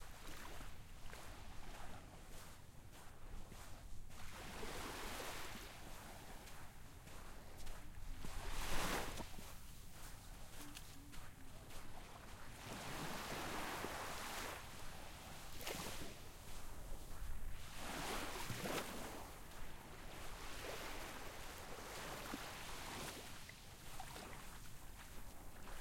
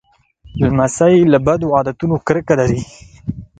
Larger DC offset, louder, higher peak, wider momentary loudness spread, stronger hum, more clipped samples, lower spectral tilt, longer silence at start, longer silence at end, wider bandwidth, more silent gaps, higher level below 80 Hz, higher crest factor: neither; second, -51 LUFS vs -14 LUFS; second, -26 dBFS vs 0 dBFS; second, 12 LU vs 17 LU; neither; neither; second, -3 dB/octave vs -7 dB/octave; second, 0 s vs 0.45 s; second, 0 s vs 0.15 s; first, 16.5 kHz vs 9.4 kHz; neither; second, -54 dBFS vs -38 dBFS; first, 22 dB vs 16 dB